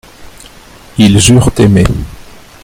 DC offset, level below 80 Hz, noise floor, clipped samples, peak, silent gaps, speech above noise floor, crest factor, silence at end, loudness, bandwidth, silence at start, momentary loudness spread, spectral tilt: under 0.1%; -24 dBFS; -35 dBFS; 0.4%; 0 dBFS; none; 29 dB; 10 dB; 0.45 s; -8 LUFS; 16.5 kHz; 0.2 s; 16 LU; -5 dB/octave